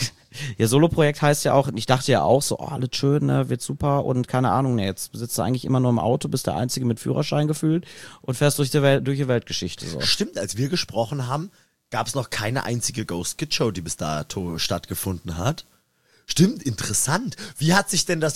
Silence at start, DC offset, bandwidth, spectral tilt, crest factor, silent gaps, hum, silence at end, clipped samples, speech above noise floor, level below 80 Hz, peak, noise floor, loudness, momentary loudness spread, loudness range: 0 s; 0.4%; 16 kHz; -5 dB/octave; 20 dB; none; none; 0 s; under 0.1%; 40 dB; -50 dBFS; -2 dBFS; -62 dBFS; -23 LUFS; 9 LU; 5 LU